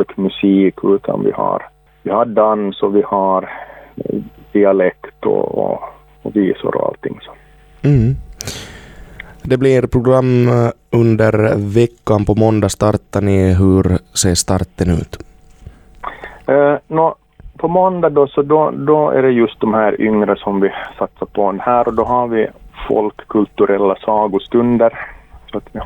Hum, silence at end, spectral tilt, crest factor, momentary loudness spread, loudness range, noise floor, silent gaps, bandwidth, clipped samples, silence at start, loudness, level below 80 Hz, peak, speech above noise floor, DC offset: none; 0 s; -6.5 dB/octave; 14 dB; 15 LU; 5 LU; -39 dBFS; none; 19 kHz; under 0.1%; 0 s; -15 LUFS; -38 dBFS; 0 dBFS; 25 dB; under 0.1%